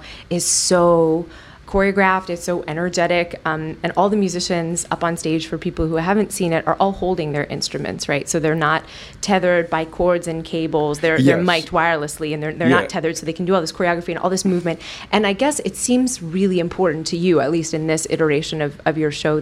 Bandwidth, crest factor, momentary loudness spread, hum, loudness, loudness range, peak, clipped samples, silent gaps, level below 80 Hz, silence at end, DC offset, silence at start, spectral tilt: 15.5 kHz; 16 dB; 8 LU; none; -19 LUFS; 2 LU; -2 dBFS; under 0.1%; none; -44 dBFS; 0 s; under 0.1%; 0 s; -4.5 dB/octave